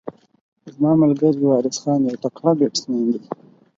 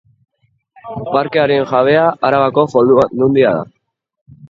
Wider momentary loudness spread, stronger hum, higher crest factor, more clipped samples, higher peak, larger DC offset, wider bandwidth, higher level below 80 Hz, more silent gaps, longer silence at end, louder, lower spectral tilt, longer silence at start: about the same, 12 LU vs 10 LU; neither; about the same, 18 dB vs 14 dB; neither; about the same, -2 dBFS vs 0 dBFS; neither; about the same, 7.8 kHz vs 7.4 kHz; second, -64 dBFS vs -52 dBFS; first, 0.41-0.52 s vs 4.21-4.26 s; first, 0.45 s vs 0.05 s; second, -19 LUFS vs -13 LUFS; about the same, -6.5 dB/octave vs -7.5 dB/octave; second, 0.05 s vs 0.85 s